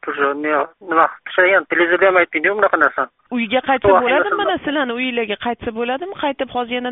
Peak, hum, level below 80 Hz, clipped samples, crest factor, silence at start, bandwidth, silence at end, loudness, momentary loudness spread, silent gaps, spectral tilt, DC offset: 0 dBFS; none; -52 dBFS; under 0.1%; 18 dB; 0.05 s; 4 kHz; 0 s; -17 LUFS; 9 LU; none; -1.5 dB/octave; under 0.1%